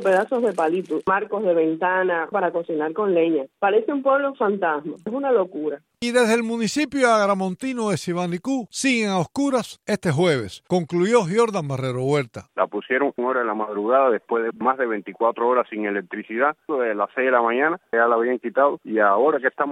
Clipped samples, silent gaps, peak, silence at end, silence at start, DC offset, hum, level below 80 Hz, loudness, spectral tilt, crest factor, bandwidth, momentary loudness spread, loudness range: under 0.1%; none; -4 dBFS; 0 s; 0 s; under 0.1%; none; -66 dBFS; -22 LUFS; -5.5 dB/octave; 16 dB; 15 kHz; 7 LU; 1 LU